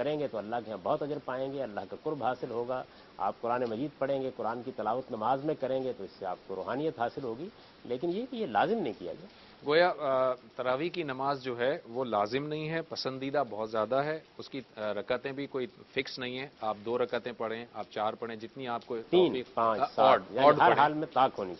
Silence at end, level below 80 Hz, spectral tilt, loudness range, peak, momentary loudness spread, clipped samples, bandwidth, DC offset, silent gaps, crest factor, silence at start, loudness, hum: 0 s; -70 dBFS; -6.5 dB/octave; 7 LU; -8 dBFS; 13 LU; under 0.1%; 6.2 kHz; under 0.1%; none; 22 dB; 0 s; -32 LUFS; none